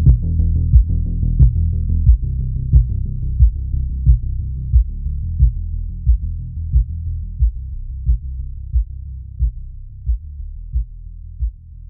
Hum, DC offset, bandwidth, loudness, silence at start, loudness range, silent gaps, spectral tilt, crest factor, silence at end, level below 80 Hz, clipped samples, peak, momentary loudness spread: none; under 0.1%; 0.7 kHz; -20 LUFS; 0 s; 9 LU; none; -17 dB/octave; 16 dB; 0.05 s; -18 dBFS; under 0.1%; 0 dBFS; 15 LU